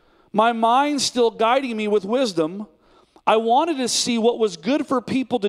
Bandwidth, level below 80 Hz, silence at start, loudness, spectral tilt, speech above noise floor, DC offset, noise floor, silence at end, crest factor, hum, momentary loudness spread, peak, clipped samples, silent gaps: 14.5 kHz; -64 dBFS; 0.35 s; -20 LUFS; -3.5 dB/octave; 35 dB; under 0.1%; -55 dBFS; 0 s; 20 dB; none; 7 LU; -2 dBFS; under 0.1%; none